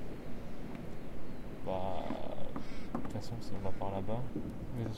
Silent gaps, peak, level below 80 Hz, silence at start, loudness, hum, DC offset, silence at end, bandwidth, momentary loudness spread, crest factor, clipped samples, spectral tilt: none; -20 dBFS; -48 dBFS; 0 s; -42 LUFS; none; under 0.1%; 0 s; 12 kHz; 9 LU; 12 dB; under 0.1%; -7.5 dB/octave